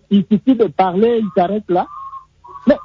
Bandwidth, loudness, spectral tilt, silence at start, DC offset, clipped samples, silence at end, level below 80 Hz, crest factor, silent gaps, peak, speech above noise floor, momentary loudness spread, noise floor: 5.6 kHz; -16 LUFS; -9.5 dB/octave; 0.1 s; under 0.1%; under 0.1%; 0 s; -52 dBFS; 14 dB; none; -2 dBFS; 23 dB; 16 LU; -38 dBFS